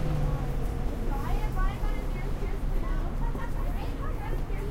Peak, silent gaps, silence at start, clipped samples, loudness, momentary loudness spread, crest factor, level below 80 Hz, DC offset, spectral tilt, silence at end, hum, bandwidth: -16 dBFS; none; 0 s; under 0.1%; -33 LUFS; 3 LU; 12 dB; -30 dBFS; under 0.1%; -7 dB/octave; 0 s; none; 15 kHz